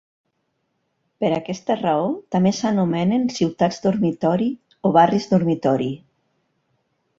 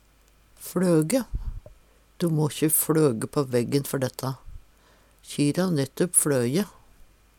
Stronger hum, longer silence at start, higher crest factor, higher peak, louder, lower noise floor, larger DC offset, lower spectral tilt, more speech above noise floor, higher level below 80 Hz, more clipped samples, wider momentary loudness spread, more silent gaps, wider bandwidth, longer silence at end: neither; first, 1.2 s vs 0.6 s; about the same, 18 dB vs 20 dB; first, -2 dBFS vs -6 dBFS; first, -20 LUFS vs -24 LUFS; first, -72 dBFS vs -59 dBFS; neither; first, -7 dB/octave vs -5 dB/octave; first, 53 dB vs 35 dB; second, -60 dBFS vs -44 dBFS; neither; second, 8 LU vs 15 LU; neither; second, 7.6 kHz vs 19 kHz; first, 1.2 s vs 0.7 s